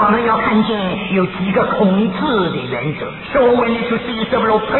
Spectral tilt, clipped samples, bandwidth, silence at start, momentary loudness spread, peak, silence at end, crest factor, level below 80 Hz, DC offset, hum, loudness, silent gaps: -10 dB/octave; under 0.1%; 4.2 kHz; 0 s; 7 LU; -2 dBFS; 0 s; 14 dB; -42 dBFS; under 0.1%; none; -16 LUFS; none